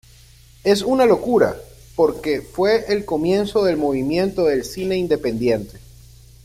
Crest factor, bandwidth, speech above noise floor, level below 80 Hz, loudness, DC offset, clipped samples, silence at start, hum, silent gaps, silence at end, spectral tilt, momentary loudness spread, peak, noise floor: 16 dB; 16 kHz; 29 dB; -46 dBFS; -19 LUFS; under 0.1%; under 0.1%; 0.65 s; none; none; 0.65 s; -5.5 dB/octave; 8 LU; -4 dBFS; -47 dBFS